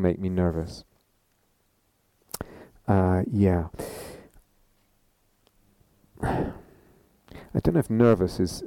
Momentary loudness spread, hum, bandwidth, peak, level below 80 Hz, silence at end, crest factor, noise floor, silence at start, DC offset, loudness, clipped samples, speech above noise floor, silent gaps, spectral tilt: 22 LU; none; 17.5 kHz; -8 dBFS; -46 dBFS; 0 s; 20 dB; -69 dBFS; 0 s; under 0.1%; -26 LUFS; under 0.1%; 45 dB; none; -7.5 dB/octave